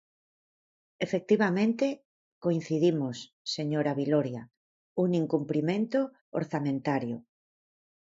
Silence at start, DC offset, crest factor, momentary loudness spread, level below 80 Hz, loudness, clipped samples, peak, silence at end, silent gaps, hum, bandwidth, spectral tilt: 1 s; under 0.1%; 18 dB; 10 LU; -74 dBFS; -29 LUFS; under 0.1%; -12 dBFS; 0.8 s; 2.05-2.41 s, 3.33-3.45 s, 4.57-4.96 s, 6.21-6.32 s; none; 7.8 kHz; -7 dB/octave